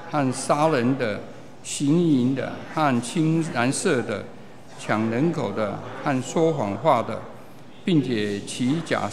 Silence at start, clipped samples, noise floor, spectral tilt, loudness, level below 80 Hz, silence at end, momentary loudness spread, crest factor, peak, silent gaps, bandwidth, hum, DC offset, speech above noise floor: 0 s; under 0.1%; -45 dBFS; -5.5 dB/octave; -24 LUFS; -66 dBFS; 0 s; 11 LU; 18 dB; -6 dBFS; none; 13.5 kHz; none; 0.8%; 22 dB